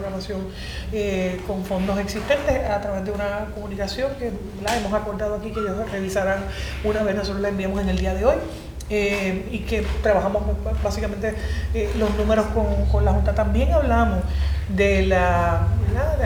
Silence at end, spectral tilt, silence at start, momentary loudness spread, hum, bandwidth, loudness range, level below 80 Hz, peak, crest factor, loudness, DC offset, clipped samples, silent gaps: 0 s; -6.5 dB/octave; 0 s; 9 LU; none; 16 kHz; 5 LU; -28 dBFS; -6 dBFS; 16 dB; -23 LUFS; under 0.1%; under 0.1%; none